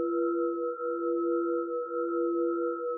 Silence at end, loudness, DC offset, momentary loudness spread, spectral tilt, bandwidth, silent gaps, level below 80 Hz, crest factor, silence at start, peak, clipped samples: 0 s; -30 LUFS; under 0.1%; 3 LU; 10.5 dB/octave; 1.5 kHz; none; under -90 dBFS; 10 dB; 0 s; -20 dBFS; under 0.1%